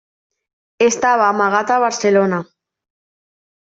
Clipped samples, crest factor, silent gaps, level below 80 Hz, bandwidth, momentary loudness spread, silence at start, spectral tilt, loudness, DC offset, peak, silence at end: under 0.1%; 16 dB; none; -64 dBFS; 8 kHz; 4 LU; 0.8 s; -4 dB/octave; -15 LUFS; under 0.1%; -2 dBFS; 1.25 s